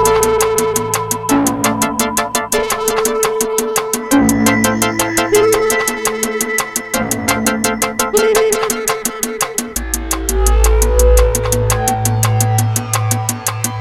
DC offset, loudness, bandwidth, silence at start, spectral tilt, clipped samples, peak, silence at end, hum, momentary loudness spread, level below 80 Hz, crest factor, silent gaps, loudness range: under 0.1%; -14 LUFS; 18.5 kHz; 0 s; -4 dB/octave; under 0.1%; 0 dBFS; 0 s; none; 6 LU; -22 dBFS; 14 dB; none; 2 LU